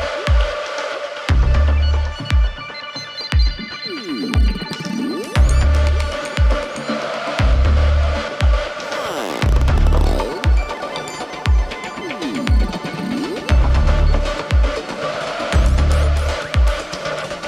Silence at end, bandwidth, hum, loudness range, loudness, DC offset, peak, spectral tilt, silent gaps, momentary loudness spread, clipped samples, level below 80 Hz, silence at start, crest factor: 0 s; 11 kHz; none; 3 LU; -19 LUFS; under 0.1%; -4 dBFS; -6 dB/octave; none; 9 LU; under 0.1%; -18 dBFS; 0 s; 14 dB